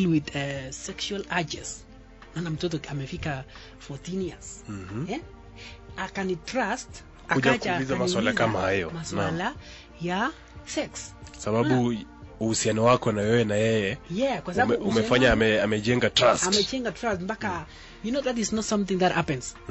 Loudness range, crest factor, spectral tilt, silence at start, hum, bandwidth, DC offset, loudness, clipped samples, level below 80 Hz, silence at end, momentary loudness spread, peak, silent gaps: 11 LU; 20 dB; -4.5 dB/octave; 0 s; none; 8.2 kHz; under 0.1%; -26 LUFS; under 0.1%; -48 dBFS; 0 s; 18 LU; -8 dBFS; none